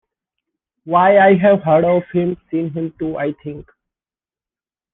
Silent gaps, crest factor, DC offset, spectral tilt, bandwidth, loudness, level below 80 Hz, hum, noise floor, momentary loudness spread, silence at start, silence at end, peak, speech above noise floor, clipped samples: none; 16 dB; under 0.1%; -10.5 dB/octave; 3.9 kHz; -15 LUFS; -54 dBFS; none; under -90 dBFS; 14 LU; 0.85 s; 1.3 s; -2 dBFS; over 75 dB; under 0.1%